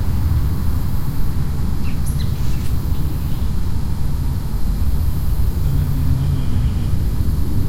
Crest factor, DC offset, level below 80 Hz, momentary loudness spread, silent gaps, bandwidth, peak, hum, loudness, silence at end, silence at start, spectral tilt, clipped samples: 10 dB; under 0.1%; -22 dBFS; 4 LU; none; 16.5 kHz; -4 dBFS; none; -21 LUFS; 0 s; 0 s; -7 dB/octave; under 0.1%